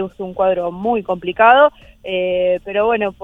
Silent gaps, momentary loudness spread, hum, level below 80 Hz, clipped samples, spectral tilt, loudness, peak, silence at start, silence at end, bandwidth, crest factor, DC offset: none; 12 LU; none; -48 dBFS; under 0.1%; -7 dB/octave; -16 LUFS; 0 dBFS; 0 s; 0.1 s; 3.9 kHz; 16 dB; under 0.1%